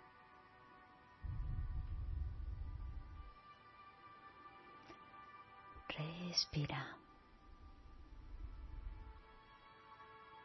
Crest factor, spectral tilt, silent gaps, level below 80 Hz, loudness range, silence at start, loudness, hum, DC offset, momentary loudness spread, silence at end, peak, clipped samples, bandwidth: 24 dB; -3.5 dB/octave; none; -52 dBFS; 12 LU; 0 s; -47 LUFS; none; under 0.1%; 20 LU; 0 s; -24 dBFS; under 0.1%; 6 kHz